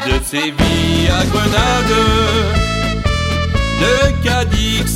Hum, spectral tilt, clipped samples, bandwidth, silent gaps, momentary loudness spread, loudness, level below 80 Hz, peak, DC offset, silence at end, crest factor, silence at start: none; -4.5 dB/octave; under 0.1%; 16.5 kHz; none; 4 LU; -14 LUFS; -22 dBFS; 0 dBFS; under 0.1%; 0 s; 14 dB; 0 s